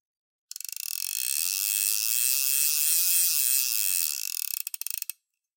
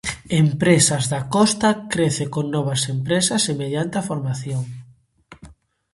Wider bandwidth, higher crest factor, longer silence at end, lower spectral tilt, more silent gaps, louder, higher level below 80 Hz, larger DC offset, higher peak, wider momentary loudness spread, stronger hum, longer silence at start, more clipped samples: first, 18 kHz vs 11.5 kHz; about the same, 20 dB vs 20 dB; about the same, 0.45 s vs 0.4 s; second, 13 dB/octave vs -4.5 dB/octave; neither; second, -24 LUFS vs -20 LUFS; second, under -90 dBFS vs -52 dBFS; neither; second, -6 dBFS vs -2 dBFS; first, 13 LU vs 10 LU; neither; first, 0.9 s vs 0.05 s; neither